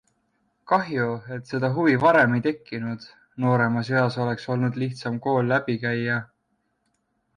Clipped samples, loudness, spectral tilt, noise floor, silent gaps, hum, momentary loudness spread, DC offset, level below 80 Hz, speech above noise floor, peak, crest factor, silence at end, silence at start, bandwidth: under 0.1%; -24 LUFS; -8 dB/octave; -73 dBFS; none; none; 13 LU; under 0.1%; -64 dBFS; 50 dB; -8 dBFS; 16 dB; 1.1 s; 0.65 s; 9.8 kHz